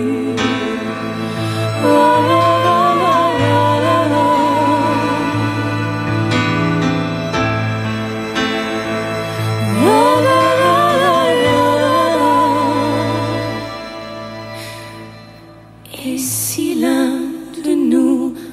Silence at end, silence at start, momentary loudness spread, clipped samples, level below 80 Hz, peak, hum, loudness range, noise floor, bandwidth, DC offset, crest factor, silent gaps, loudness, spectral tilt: 0 s; 0 s; 13 LU; under 0.1%; -46 dBFS; -2 dBFS; none; 8 LU; -39 dBFS; 16 kHz; under 0.1%; 14 dB; none; -15 LUFS; -5.5 dB/octave